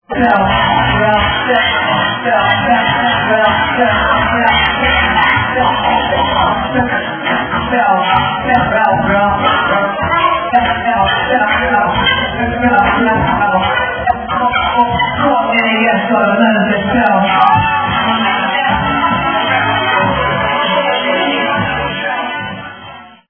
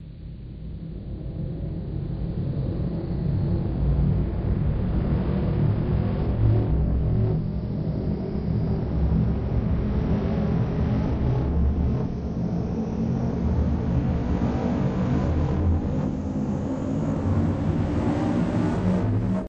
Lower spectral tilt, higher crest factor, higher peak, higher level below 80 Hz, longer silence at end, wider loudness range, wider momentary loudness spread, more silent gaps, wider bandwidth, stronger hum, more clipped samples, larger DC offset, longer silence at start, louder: second, -8.5 dB/octave vs -10 dB/octave; about the same, 12 dB vs 16 dB; first, 0 dBFS vs -8 dBFS; about the same, -32 dBFS vs -30 dBFS; first, 0.2 s vs 0 s; about the same, 2 LU vs 2 LU; second, 4 LU vs 7 LU; neither; second, 5.4 kHz vs 7.4 kHz; neither; neither; neither; about the same, 0.1 s vs 0 s; first, -12 LUFS vs -25 LUFS